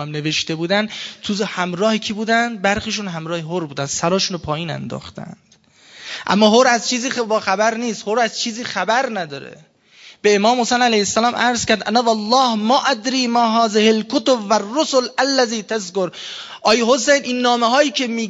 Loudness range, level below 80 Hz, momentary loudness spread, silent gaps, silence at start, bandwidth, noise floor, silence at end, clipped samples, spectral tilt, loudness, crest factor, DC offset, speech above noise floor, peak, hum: 5 LU; -54 dBFS; 11 LU; none; 0 s; 8 kHz; -48 dBFS; 0 s; under 0.1%; -3.5 dB/octave; -17 LUFS; 18 dB; under 0.1%; 30 dB; 0 dBFS; none